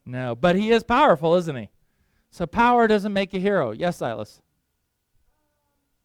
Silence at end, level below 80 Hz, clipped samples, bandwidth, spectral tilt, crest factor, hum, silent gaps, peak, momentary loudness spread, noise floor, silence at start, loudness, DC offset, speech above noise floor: 1.8 s; -50 dBFS; under 0.1%; 15 kHz; -6.5 dB/octave; 18 dB; none; none; -6 dBFS; 15 LU; -75 dBFS; 0.05 s; -21 LUFS; under 0.1%; 54 dB